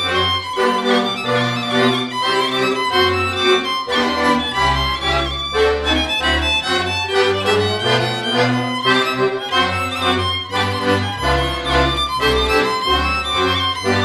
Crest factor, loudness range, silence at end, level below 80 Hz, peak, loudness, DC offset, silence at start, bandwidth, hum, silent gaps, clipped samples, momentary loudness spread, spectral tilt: 16 dB; 1 LU; 0 s; -32 dBFS; -2 dBFS; -17 LUFS; under 0.1%; 0 s; 14 kHz; none; none; under 0.1%; 3 LU; -4 dB/octave